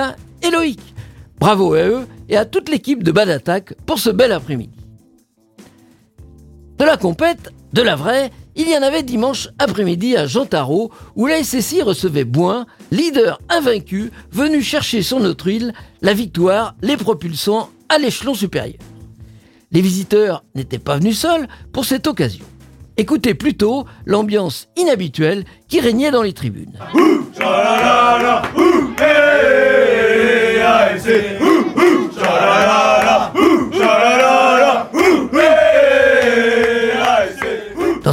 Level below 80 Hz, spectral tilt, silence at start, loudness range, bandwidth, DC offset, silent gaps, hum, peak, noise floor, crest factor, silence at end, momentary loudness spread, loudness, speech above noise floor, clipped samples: -44 dBFS; -5 dB/octave; 0 s; 7 LU; 17 kHz; under 0.1%; none; none; 0 dBFS; -54 dBFS; 14 dB; 0 s; 11 LU; -14 LUFS; 39 dB; under 0.1%